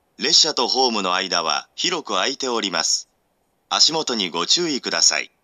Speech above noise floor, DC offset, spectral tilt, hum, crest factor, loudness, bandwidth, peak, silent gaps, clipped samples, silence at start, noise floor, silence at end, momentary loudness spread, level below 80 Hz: 47 dB; under 0.1%; -0.5 dB/octave; none; 20 dB; -18 LUFS; 13.5 kHz; -2 dBFS; none; under 0.1%; 0.2 s; -67 dBFS; 0.15 s; 8 LU; -76 dBFS